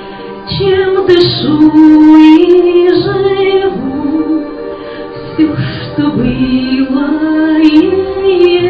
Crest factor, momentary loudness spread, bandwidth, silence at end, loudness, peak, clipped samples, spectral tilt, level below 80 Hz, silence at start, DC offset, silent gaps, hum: 8 dB; 16 LU; 5.6 kHz; 0 s; -9 LUFS; 0 dBFS; 4%; -8 dB/octave; -36 dBFS; 0 s; under 0.1%; none; none